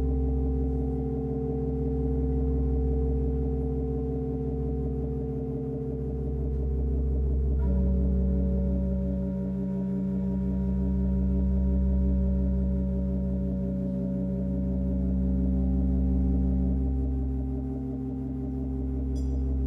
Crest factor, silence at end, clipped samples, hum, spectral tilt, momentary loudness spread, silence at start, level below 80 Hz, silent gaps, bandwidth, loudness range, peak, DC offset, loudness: 12 dB; 0 s; under 0.1%; none; -12 dB/octave; 6 LU; 0 s; -30 dBFS; none; 1.9 kHz; 3 LU; -16 dBFS; under 0.1%; -29 LUFS